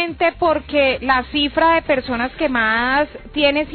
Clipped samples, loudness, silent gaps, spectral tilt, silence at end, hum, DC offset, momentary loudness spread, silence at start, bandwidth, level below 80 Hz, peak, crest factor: under 0.1%; -17 LUFS; none; -9.5 dB/octave; 0 s; none; under 0.1%; 4 LU; 0 s; 4.6 kHz; -40 dBFS; -4 dBFS; 14 dB